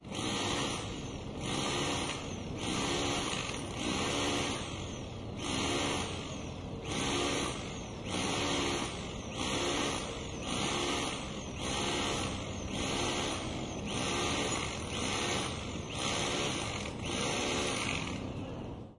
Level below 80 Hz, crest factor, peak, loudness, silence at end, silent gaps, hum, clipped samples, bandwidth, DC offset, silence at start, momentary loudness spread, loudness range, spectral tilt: -50 dBFS; 18 dB; -18 dBFS; -34 LUFS; 0.05 s; none; none; under 0.1%; 12 kHz; under 0.1%; 0 s; 8 LU; 1 LU; -3.5 dB/octave